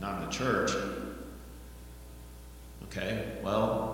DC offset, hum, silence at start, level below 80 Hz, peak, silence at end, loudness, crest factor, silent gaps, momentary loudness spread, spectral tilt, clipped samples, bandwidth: under 0.1%; none; 0 s; -48 dBFS; -16 dBFS; 0 s; -33 LUFS; 18 dB; none; 20 LU; -5 dB/octave; under 0.1%; 17 kHz